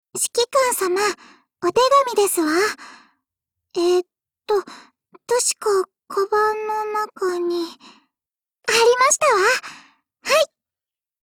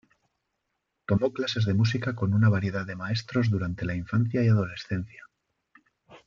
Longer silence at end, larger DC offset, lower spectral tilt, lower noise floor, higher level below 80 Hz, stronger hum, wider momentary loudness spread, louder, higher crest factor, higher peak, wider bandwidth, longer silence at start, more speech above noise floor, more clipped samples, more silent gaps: first, 0.75 s vs 0.1 s; neither; second, -1 dB/octave vs -7.5 dB/octave; first, under -90 dBFS vs -80 dBFS; second, -66 dBFS vs -58 dBFS; neither; about the same, 11 LU vs 10 LU; first, -19 LUFS vs -27 LUFS; about the same, 16 dB vs 18 dB; first, -6 dBFS vs -10 dBFS; first, 20 kHz vs 7.2 kHz; second, 0.15 s vs 1.1 s; first, over 71 dB vs 55 dB; neither; neither